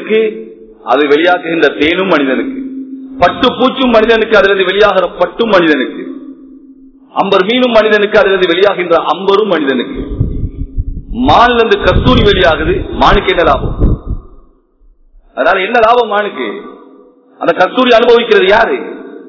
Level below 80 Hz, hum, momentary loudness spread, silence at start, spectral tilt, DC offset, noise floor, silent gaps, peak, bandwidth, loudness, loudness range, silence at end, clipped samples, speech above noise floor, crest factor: -24 dBFS; none; 15 LU; 0 s; -6.5 dB/octave; under 0.1%; -46 dBFS; none; 0 dBFS; 6 kHz; -10 LUFS; 4 LU; 0 s; 2%; 37 dB; 10 dB